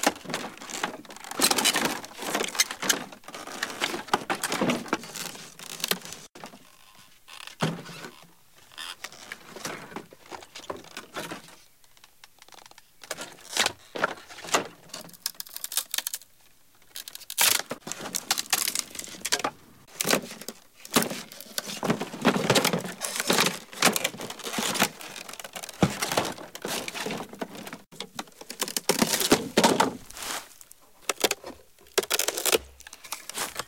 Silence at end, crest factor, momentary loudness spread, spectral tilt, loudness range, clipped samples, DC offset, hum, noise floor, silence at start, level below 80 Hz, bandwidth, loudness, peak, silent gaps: 0 s; 26 dB; 19 LU; -2 dB/octave; 13 LU; under 0.1%; 0.1%; none; -60 dBFS; 0 s; -62 dBFS; 17 kHz; -27 LUFS; -6 dBFS; none